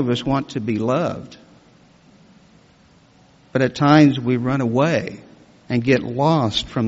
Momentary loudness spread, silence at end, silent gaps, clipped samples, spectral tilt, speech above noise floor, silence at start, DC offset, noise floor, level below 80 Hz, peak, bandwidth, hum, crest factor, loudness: 12 LU; 0 s; none; under 0.1%; -5.5 dB/octave; 34 dB; 0 s; under 0.1%; -52 dBFS; -50 dBFS; -2 dBFS; 8 kHz; none; 18 dB; -19 LUFS